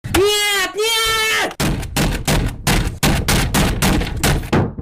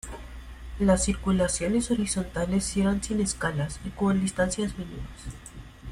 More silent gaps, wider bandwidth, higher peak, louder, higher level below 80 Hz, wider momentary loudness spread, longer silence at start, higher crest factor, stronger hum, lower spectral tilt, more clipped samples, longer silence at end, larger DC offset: neither; first, 16 kHz vs 13 kHz; about the same, -6 dBFS vs -8 dBFS; first, -17 LUFS vs -27 LUFS; first, -24 dBFS vs -40 dBFS; second, 5 LU vs 18 LU; about the same, 0.05 s vs 0.05 s; second, 12 dB vs 18 dB; neither; second, -3.5 dB/octave vs -5 dB/octave; neither; about the same, 0 s vs 0 s; neither